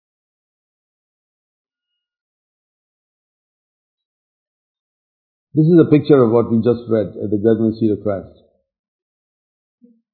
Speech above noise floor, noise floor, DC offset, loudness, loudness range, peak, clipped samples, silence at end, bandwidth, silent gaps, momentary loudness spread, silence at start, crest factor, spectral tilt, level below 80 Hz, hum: 66 dB; -80 dBFS; under 0.1%; -15 LUFS; 6 LU; 0 dBFS; under 0.1%; 1.9 s; 4.5 kHz; none; 10 LU; 5.55 s; 20 dB; -13.5 dB/octave; -60 dBFS; none